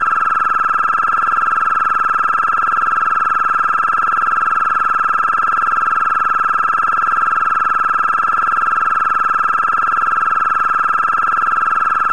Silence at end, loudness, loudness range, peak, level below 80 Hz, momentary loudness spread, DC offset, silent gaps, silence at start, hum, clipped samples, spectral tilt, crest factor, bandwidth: 0 s; -14 LUFS; 0 LU; -6 dBFS; -52 dBFS; 0 LU; 2%; none; 0 s; none; under 0.1%; -3 dB/octave; 10 dB; 10.5 kHz